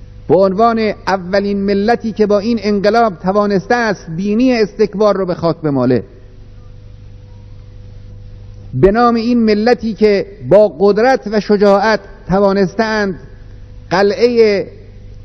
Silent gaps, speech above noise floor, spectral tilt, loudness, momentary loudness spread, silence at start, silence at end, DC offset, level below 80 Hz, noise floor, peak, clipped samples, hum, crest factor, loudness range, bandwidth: none; 23 dB; -7 dB/octave; -13 LUFS; 7 LU; 0 s; 0 s; under 0.1%; -36 dBFS; -35 dBFS; 0 dBFS; 0.1%; 50 Hz at -35 dBFS; 14 dB; 6 LU; 6.4 kHz